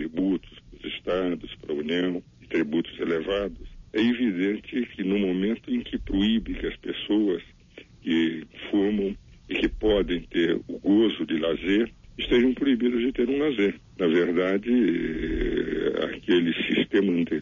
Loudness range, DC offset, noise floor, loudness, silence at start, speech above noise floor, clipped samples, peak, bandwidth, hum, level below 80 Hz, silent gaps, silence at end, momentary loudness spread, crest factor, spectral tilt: 4 LU; under 0.1%; -50 dBFS; -26 LUFS; 0 s; 24 dB; under 0.1%; -10 dBFS; 7.2 kHz; none; -44 dBFS; none; 0 s; 9 LU; 14 dB; -7 dB/octave